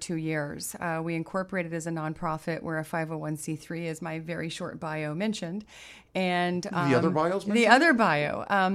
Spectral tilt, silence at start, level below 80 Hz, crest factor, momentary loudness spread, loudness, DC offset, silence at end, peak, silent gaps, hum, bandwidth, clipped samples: -5 dB/octave; 0 s; -62 dBFS; 24 dB; 13 LU; -28 LUFS; under 0.1%; 0 s; -4 dBFS; none; none; 15.5 kHz; under 0.1%